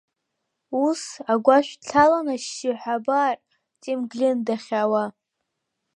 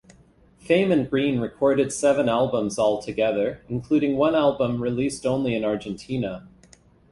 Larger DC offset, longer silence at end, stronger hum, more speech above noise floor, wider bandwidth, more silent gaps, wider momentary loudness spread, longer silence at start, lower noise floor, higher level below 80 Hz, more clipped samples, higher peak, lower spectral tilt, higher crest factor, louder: neither; first, 0.85 s vs 0.65 s; neither; first, 58 dB vs 33 dB; about the same, 11 kHz vs 11.5 kHz; neither; first, 12 LU vs 9 LU; about the same, 0.7 s vs 0.65 s; first, -80 dBFS vs -55 dBFS; second, -64 dBFS vs -54 dBFS; neither; first, -2 dBFS vs -6 dBFS; second, -4 dB/octave vs -6 dB/octave; about the same, 20 dB vs 16 dB; about the same, -23 LUFS vs -23 LUFS